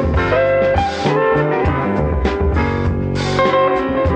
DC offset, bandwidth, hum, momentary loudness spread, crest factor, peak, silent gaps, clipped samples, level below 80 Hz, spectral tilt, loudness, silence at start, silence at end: under 0.1%; 8.8 kHz; none; 4 LU; 14 dB; -2 dBFS; none; under 0.1%; -26 dBFS; -7 dB/octave; -16 LUFS; 0 s; 0 s